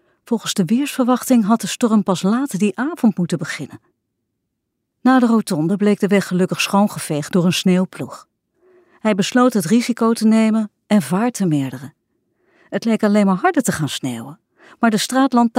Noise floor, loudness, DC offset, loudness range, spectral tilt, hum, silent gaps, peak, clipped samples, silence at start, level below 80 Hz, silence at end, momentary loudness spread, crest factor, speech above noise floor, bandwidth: -75 dBFS; -17 LUFS; under 0.1%; 3 LU; -5.5 dB/octave; none; none; -4 dBFS; under 0.1%; 0.3 s; -64 dBFS; 0 s; 10 LU; 14 dB; 59 dB; 16 kHz